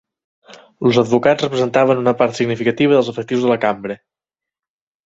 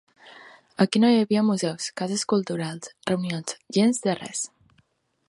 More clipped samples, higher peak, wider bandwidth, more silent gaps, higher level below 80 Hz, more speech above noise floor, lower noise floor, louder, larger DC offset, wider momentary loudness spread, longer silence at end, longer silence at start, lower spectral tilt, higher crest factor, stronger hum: neither; first, -2 dBFS vs -6 dBFS; second, 8 kHz vs 11.5 kHz; neither; first, -58 dBFS vs -70 dBFS; first, 73 dB vs 43 dB; first, -88 dBFS vs -66 dBFS; first, -16 LUFS vs -24 LUFS; neither; second, 6 LU vs 12 LU; first, 1.1 s vs 0.8 s; first, 0.5 s vs 0.25 s; about the same, -6 dB/octave vs -5 dB/octave; about the same, 16 dB vs 20 dB; neither